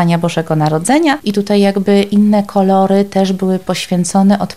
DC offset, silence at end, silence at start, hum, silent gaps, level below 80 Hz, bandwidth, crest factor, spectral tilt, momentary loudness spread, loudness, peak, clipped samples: 0.9%; 0 s; 0 s; none; none; -50 dBFS; 14.5 kHz; 10 dB; -6 dB/octave; 5 LU; -13 LUFS; -2 dBFS; under 0.1%